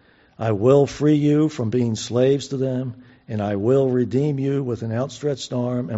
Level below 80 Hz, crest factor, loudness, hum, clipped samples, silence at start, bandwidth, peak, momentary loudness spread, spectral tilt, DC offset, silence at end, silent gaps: -56 dBFS; 16 dB; -21 LUFS; none; under 0.1%; 0.4 s; 8 kHz; -4 dBFS; 9 LU; -7.5 dB/octave; under 0.1%; 0 s; none